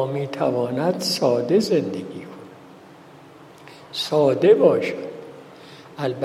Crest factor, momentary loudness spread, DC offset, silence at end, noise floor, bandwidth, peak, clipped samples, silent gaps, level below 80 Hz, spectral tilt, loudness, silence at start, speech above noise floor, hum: 20 dB; 24 LU; under 0.1%; 0 s; -45 dBFS; 15.5 kHz; -2 dBFS; under 0.1%; none; -70 dBFS; -5.5 dB/octave; -20 LUFS; 0 s; 25 dB; none